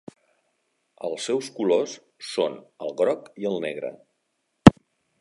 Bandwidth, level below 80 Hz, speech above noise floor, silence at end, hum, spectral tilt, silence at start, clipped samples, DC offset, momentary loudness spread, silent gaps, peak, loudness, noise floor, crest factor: 11.5 kHz; -46 dBFS; 49 dB; 0.5 s; none; -6.5 dB/octave; 1.05 s; under 0.1%; under 0.1%; 19 LU; none; 0 dBFS; -23 LUFS; -75 dBFS; 24 dB